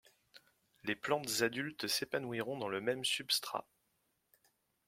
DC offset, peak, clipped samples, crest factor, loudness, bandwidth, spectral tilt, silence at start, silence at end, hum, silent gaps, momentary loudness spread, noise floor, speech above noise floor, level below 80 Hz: under 0.1%; -18 dBFS; under 0.1%; 22 dB; -37 LUFS; 16.5 kHz; -2.5 dB/octave; 0.35 s; 1.25 s; none; none; 8 LU; -80 dBFS; 43 dB; -80 dBFS